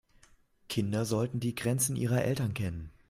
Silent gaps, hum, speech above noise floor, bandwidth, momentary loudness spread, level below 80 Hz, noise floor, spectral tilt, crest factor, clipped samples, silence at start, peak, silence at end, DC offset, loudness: none; none; 32 dB; 16 kHz; 7 LU; -58 dBFS; -63 dBFS; -5.5 dB/octave; 18 dB; under 0.1%; 0.7 s; -14 dBFS; 0.2 s; under 0.1%; -31 LUFS